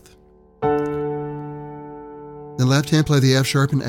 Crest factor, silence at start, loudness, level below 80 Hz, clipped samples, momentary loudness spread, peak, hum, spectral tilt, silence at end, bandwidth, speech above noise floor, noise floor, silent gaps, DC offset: 16 dB; 0.6 s; -19 LUFS; -48 dBFS; under 0.1%; 20 LU; -4 dBFS; none; -6 dB/octave; 0 s; 16.5 kHz; 34 dB; -51 dBFS; none; under 0.1%